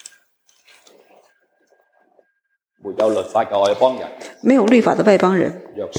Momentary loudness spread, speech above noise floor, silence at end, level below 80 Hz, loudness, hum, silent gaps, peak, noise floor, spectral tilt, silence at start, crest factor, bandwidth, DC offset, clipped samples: 17 LU; 55 dB; 0 s; -66 dBFS; -16 LUFS; none; none; -2 dBFS; -71 dBFS; -6 dB/octave; 2.85 s; 18 dB; 11.5 kHz; under 0.1%; under 0.1%